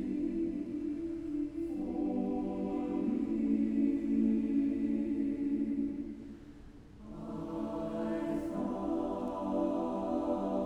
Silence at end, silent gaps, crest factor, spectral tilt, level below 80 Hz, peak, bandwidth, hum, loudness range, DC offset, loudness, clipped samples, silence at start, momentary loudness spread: 0 s; none; 14 dB; -9 dB/octave; -56 dBFS; -20 dBFS; 8.2 kHz; none; 6 LU; under 0.1%; -35 LUFS; under 0.1%; 0 s; 12 LU